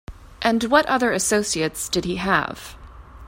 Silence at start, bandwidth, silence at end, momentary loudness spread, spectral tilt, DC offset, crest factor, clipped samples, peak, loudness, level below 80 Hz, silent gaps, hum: 0.1 s; 16.5 kHz; 0 s; 10 LU; -3 dB/octave; under 0.1%; 20 dB; under 0.1%; -2 dBFS; -21 LUFS; -44 dBFS; none; none